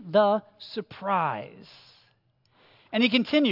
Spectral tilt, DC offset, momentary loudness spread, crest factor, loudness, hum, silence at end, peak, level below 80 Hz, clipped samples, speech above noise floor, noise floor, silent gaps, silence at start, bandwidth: -6.5 dB/octave; under 0.1%; 15 LU; 18 dB; -26 LUFS; none; 0 s; -8 dBFS; -76 dBFS; under 0.1%; 42 dB; -67 dBFS; none; 0 s; 5.8 kHz